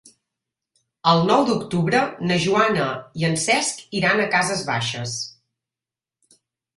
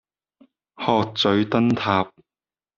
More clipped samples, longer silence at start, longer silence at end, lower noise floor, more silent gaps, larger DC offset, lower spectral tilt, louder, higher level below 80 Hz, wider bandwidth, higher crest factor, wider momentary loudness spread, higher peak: neither; first, 1.05 s vs 0.8 s; first, 1.45 s vs 0.7 s; about the same, -90 dBFS vs under -90 dBFS; neither; neither; about the same, -4 dB/octave vs -4 dB/octave; about the same, -20 LUFS vs -21 LUFS; about the same, -58 dBFS vs -60 dBFS; first, 11.5 kHz vs 7.2 kHz; about the same, 20 dB vs 18 dB; about the same, 8 LU vs 7 LU; about the same, -2 dBFS vs -4 dBFS